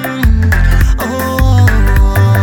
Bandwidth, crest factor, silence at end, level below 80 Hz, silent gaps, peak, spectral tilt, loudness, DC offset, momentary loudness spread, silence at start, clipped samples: 17.5 kHz; 8 dB; 0 s; -12 dBFS; none; 0 dBFS; -6.5 dB/octave; -11 LUFS; under 0.1%; 4 LU; 0 s; under 0.1%